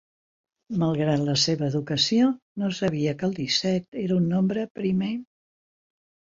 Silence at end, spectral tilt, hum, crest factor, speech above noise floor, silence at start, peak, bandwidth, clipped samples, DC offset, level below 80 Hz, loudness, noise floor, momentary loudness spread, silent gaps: 0.95 s; -5.5 dB/octave; none; 16 dB; over 66 dB; 0.7 s; -10 dBFS; 7.8 kHz; under 0.1%; under 0.1%; -60 dBFS; -25 LUFS; under -90 dBFS; 7 LU; 2.42-2.56 s, 3.88-3.92 s, 4.70-4.75 s